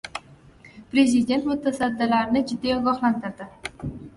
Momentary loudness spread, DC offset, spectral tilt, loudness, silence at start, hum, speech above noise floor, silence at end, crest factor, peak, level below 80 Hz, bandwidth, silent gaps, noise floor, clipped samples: 16 LU; under 0.1%; -5 dB/octave; -23 LUFS; 0.05 s; none; 27 dB; 0.05 s; 18 dB; -6 dBFS; -52 dBFS; 11.5 kHz; none; -49 dBFS; under 0.1%